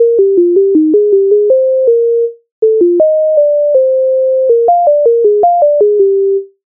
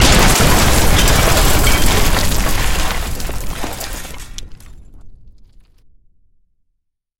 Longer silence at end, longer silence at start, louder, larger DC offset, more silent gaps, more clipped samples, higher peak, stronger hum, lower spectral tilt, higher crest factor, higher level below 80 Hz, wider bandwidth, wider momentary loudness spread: second, 0.2 s vs 1.75 s; about the same, 0 s vs 0 s; first, -9 LUFS vs -14 LUFS; neither; first, 2.52-2.62 s vs none; neither; about the same, 0 dBFS vs 0 dBFS; neither; first, -13 dB/octave vs -3.5 dB/octave; second, 8 dB vs 14 dB; second, -64 dBFS vs -18 dBFS; second, 1.2 kHz vs 17 kHz; second, 3 LU vs 17 LU